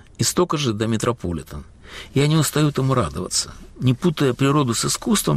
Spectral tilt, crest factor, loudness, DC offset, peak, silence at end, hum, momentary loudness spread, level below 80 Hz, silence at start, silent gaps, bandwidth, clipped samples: -5 dB/octave; 14 dB; -20 LUFS; under 0.1%; -8 dBFS; 0 s; none; 13 LU; -44 dBFS; 0.2 s; none; 15.5 kHz; under 0.1%